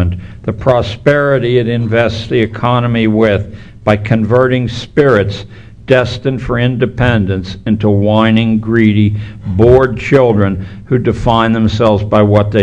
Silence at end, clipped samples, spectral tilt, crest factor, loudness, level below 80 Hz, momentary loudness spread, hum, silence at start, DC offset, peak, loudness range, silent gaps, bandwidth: 0 s; 0.6%; -8 dB/octave; 12 dB; -12 LUFS; -32 dBFS; 8 LU; none; 0 s; 0.8%; 0 dBFS; 2 LU; none; 8.4 kHz